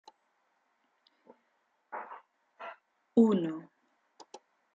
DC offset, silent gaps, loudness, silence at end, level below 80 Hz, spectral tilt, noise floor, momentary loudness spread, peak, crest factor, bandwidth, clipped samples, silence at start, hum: under 0.1%; none; -29 LUFS; 0.4 s; -82 dBFS; -8 dB/octave; -76 dBFS; 28 LU; -12 dBFS; 24 dB; 7.6 kHz; under 0.1%; 1.9 s; none